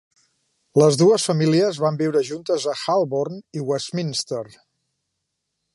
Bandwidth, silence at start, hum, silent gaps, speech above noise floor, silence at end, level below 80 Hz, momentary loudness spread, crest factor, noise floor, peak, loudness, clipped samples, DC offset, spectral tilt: 11.5 kHz; 0.75 s; none; none; 58 dB; 1.3 s; -68 dBFS; 12 LU; 18 dB; -78 dBFS; -4 dBFS; -21 LUFS; under 0.1%; under 0.1%; -5.5 dB/octave